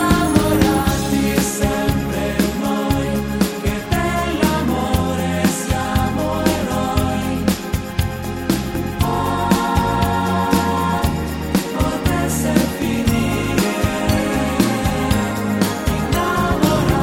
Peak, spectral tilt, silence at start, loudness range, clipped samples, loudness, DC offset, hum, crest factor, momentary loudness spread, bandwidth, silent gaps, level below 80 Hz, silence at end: 0 dBFS; -5.5 dB/octave; 0 s; 2 LU; under 0.1%; -18 LUFS; under 0.1%; none; 18 dB; 4 LU; 16.5 kHz; none; -30 dBFS; 0 s